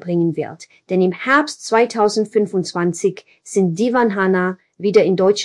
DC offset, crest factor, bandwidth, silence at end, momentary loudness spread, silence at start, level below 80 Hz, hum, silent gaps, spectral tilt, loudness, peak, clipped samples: under 0.1%; 16 dB; 12 kHz; 0 s; 8 LU; 0.05 s; -68 dBFS; none; none; -5.5 dB/octave; -17 LUFS; -2 dBFS; under 0.1%